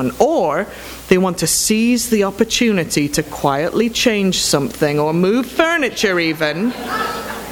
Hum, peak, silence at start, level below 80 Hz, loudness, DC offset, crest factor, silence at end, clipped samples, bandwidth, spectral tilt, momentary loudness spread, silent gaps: none; 0 dBFS; 0 s; -44 dBFS; -16 LUFS; under 0.1%; 16 dB; 0 s; under 0.1%; over 20 kHz; -4 dB/octave; 6 LU; none